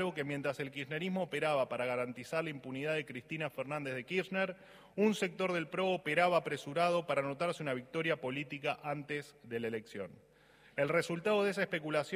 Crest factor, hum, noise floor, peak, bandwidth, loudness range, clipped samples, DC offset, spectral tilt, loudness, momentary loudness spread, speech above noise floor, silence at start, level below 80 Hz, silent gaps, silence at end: 20 dB; none; -62 dBFS; -16 dBFS; 15.5 kHz; 5 LU; under 0.1%; under 0.1%; -5.5 dB/octave; -36 LUFS; 9 LU; 27 dB; 0 s; -78 dBFS; none; 0 s